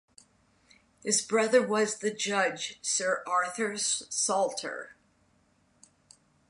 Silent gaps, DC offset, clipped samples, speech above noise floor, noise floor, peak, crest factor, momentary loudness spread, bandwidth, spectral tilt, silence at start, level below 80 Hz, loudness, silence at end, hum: none; under 0.1%; under 0.1%; 39 dB; -68 dBFS; -10 dBFS; 22 dB; 11 LU; 11.5 kHz; -1.5 dB/octave; 1.05 s; -76 dBFS; -28 LUFS; 1.6 s; none